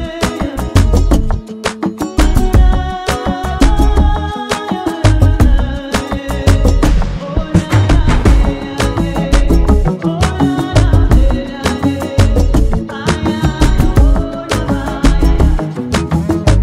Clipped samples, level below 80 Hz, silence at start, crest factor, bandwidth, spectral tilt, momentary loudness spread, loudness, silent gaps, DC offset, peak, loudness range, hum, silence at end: under 0.1%; -14 dBFS; 0 s; 10 dB; 14 kHz; -6.5 dB/octave; 7 LU; -14 LUFS; none; under 0.1%; 0 dBFS; 1 LU; none; 0 s